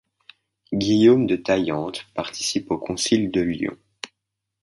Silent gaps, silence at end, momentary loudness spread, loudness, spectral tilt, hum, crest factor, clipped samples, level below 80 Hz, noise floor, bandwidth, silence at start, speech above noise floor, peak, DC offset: none; 0.55 s; 17 LU; -22 LUFS; -4.5 dB/octave; none; 18 dB; under 0.1%; -54 dBFS; -81 dBFS; 11.5 kHz; 0.7 s; 61 dB; -4 dBFS; under 0.1%